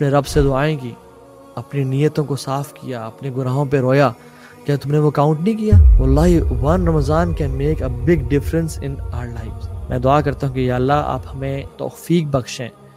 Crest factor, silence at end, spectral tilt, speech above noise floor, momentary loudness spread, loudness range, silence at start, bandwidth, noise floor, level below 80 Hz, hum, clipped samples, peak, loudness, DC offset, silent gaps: 16 dB; 0.25 s; -7.5 dB/octave; 25 dB; 14 LU; 5 LU; 0 s; 16 kHz; -42 dBFS; -24 dBFS; none; under 0.1%; 0 dBFS; -18 LUFS; under 0.1%; none